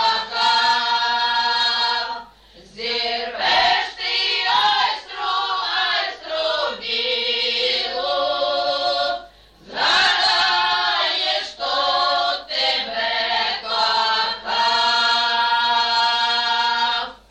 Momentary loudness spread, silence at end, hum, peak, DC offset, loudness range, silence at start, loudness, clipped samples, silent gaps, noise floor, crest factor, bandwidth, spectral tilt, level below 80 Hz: 6 LU; 0.15 s; none; -8 dBFS; under 0.1%; 3 LU; 0 s; -18 LUFS; under 0.1%; none; -47 dBFS; 14 dB; 9.8 kHz; -0.5 dB/octave; -56 dBFS